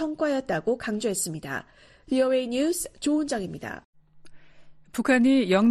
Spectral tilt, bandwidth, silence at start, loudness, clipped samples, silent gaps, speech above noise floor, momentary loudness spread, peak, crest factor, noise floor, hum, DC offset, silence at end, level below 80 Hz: -4.5 dB/octave; 13 kHz; 0 s; -25 LUFS; under 0.1%; 3.85-3.93 s; 23 dB; 15 LU; -10 dBFS; 16 dB; -48 dBFS; none; under 0.1%; 0 s; -58 dBFS